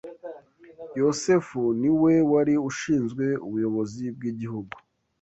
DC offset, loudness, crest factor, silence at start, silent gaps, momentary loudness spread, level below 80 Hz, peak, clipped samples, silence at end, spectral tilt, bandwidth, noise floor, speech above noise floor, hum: under 0.1%; -24 LUFS; 16 dB; 0.05 s; none; 21 LU; -62 dBFS; -10 dBFS; under 0.1%; 0.45 s; -6.5 dB/octave; 8.2 kHz; -47 dBFS; 24 dB; none